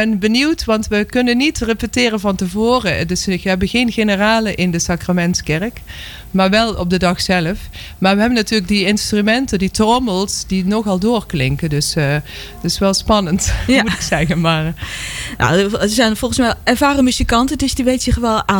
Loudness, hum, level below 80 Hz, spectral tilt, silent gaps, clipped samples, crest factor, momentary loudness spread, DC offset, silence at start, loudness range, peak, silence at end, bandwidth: -15 LUFS; none; -30 dBFS; -4.5 dB/octave; none; under 0.1%; 12 dB; 6 LU; under 0.1%; 0 s; 2 LU; -4 dBFS; 0 s; 18.5 kHz